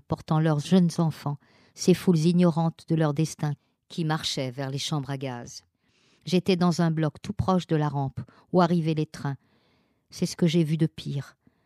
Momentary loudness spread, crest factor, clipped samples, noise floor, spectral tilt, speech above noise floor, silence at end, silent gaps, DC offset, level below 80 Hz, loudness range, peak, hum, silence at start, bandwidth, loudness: 15 LU; 18 dB; under 0.1%; -67 dBFS; -6.5 dB/octave; 42 dB; 0.35 s; none; under 0.1%; -58 dBFS; 5 LU; -8 dBFS; none; 0.1 s; 13.5 kHz; -26 LUFS